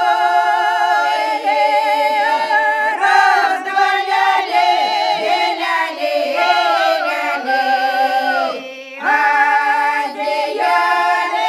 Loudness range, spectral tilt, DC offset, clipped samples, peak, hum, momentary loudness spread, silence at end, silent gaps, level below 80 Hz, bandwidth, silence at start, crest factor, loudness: 2 LU; -0.5 dB/octave; under 0.1%; under 0.1%; 0 dBFS; none; 5 LU; 0 s; none; -80 dBFS; 14 kHz; 0 s; 14 dB; -15 LUFS